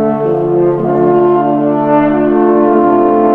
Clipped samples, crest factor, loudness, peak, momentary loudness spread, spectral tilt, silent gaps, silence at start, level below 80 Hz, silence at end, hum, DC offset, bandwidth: under 0.1%; 10 dB; -10 LUFS; 0 dBFS; 3 LU; -11 dB/octave; none; 0 s; -42 dBFS; 0 s; none; under 0.1%; 3.5 kHz